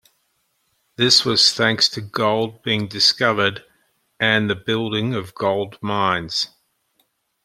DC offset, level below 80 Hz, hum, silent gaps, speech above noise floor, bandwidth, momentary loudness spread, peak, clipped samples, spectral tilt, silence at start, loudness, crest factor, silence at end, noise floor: under 0.1%; -60 dBFS; none; none; 49 dB; 15 kHz; 10 LU; 0 dBFS; under 0.1%; -3.5 dB/octave; 1 s; -18 LUFS; 22 dB; 1 s; -68 dBFS